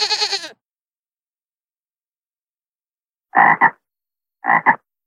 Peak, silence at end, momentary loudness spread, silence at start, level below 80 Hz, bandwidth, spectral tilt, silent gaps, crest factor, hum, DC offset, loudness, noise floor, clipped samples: 0 dBFS; 0.3 s; 13 LU; 0 s; -72 dBFS; 12 kHz; -1.5 dB/octave; 0.82-1.03 s, 1.23-1.33 s, 1.42-1.46 s, 1.64-1.68 s, 2.19-2.31 s, 2.41-2.53 s, 2.66-2.75 s, 3.04-3.08 s; 20 dB; none; under 0.1%; -16 LUFS; under -90 dBFS; under 0.1%